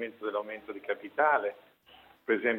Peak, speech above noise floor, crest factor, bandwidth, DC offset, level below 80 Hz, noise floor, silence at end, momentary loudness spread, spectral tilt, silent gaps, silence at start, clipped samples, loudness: -12 dBFS; 28 dB; 20 dB; 16.5 kHz; under 0.1%; -80 dBFS; -59 dBFS; 0 s; 14 LU; -6.5 dB/octave; none; 0 s; under 0.1%; -31 LUFS